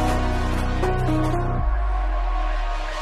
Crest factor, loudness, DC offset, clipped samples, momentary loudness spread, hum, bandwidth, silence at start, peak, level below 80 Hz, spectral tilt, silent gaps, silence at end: 12 dB; -24 LUFS; under 0.1%; under 0.1%; 5 LU; none; 12.5 kHz; 0 s; -10 dBFS; -24 dBFS; -6.5 dB/octave; none; 0 s